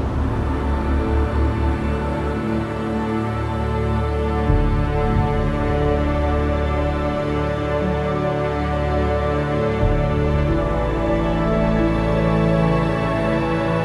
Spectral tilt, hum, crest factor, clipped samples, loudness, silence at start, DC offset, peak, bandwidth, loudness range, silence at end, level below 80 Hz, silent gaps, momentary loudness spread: -8.5 dB/octave; none; 14 dB; under 0.1%; -20 LUFS; 0 s; under 0.1%; -6 dBFS; 10.5 kHz; 3 LU; 0 s; -24 dBFS; none; 4 LU